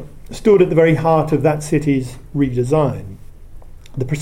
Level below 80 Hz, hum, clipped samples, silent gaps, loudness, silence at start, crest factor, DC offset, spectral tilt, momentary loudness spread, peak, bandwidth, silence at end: -36 dBFS; none; under 0.1%; none; -16 LUFS; 0 s; 16 dB; under 0.1%; -7.5 dB/octave; 17 LU; 0 dBFS; 15.5 kHz; 0 s